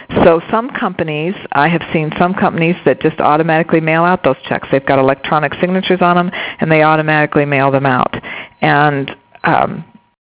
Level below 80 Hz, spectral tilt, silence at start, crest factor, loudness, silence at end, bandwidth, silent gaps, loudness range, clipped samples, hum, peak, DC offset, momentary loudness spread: -44 dBFS; -10 dB/octave; 0 s; 14 dB; -13 LUFS; 0.45 s; 4 kHz; none; 2 LU; 0.3%; none; 0 dBFS; under 0.1%; 8 LU